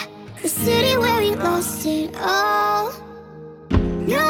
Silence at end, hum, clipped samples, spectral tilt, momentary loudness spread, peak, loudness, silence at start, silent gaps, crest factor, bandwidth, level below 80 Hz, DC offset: 0 s; none; under 0.1%; -4 dB/octave; 20 LU; -4 dBFS; -20 LUFS; 0 s; none; 16 dB; over 20 kHz; -38 dBFS; under 0.1%